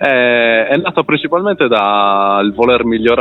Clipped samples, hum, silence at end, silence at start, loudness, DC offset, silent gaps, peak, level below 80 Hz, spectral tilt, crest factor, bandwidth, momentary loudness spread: under 0.1%; none; 0 s; 0 s; -12 LUFS; under 0.1%; none; 0 dBFS; -46 dBFS; -7.5 dB/octave; 12 dB; 5.4 kHz; 4 LU